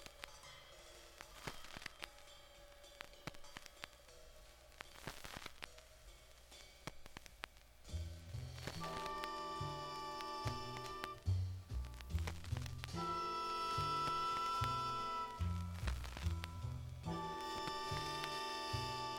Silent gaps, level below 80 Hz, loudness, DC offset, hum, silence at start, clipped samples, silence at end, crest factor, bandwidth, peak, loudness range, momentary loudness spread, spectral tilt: none; -54 dBFS; -45 LUFS; under 0.1%; none; 0 s; under 0.1%; 0 s; 24 dB; 17.5 kHz; -22 dBFS; 14 LU; 19 LU; -4.5 dB/octave